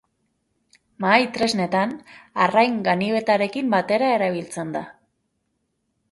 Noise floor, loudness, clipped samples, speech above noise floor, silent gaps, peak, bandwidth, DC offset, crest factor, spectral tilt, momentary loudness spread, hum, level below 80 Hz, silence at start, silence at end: -73 dBFS; -21 LUFS; under 0.1%; 52 dB; none; -2 dBFS; 11.5 kHz; under 0.1%; 22 dB; -5 dB/octave; 12 LU; none; -66 dBFS; 1 s; 1.2 s